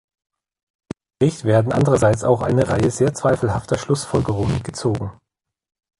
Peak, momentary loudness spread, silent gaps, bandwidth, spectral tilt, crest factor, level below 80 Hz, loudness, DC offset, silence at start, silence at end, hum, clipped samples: -2 dBFS; 9 LU; none; 11.5 kHz; -6.5 dB/octave; 16 dB; -42 dBFS; -19 LUFS; under 0.1%; 1.2 s; 0.9 s; none; under 0.1%